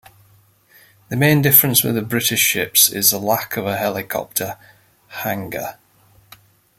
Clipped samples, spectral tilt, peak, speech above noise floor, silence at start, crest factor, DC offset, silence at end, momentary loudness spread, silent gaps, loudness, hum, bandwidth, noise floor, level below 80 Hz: under 0.1%; -3 dB/octave; 0 dBFS; 36 dB; 1.1 s; 20 dB; under 0.1%; 1.05 s; 17 LU; none; -16 LUFS; none; 17 kHz; -54 dBFS; -56 dBFS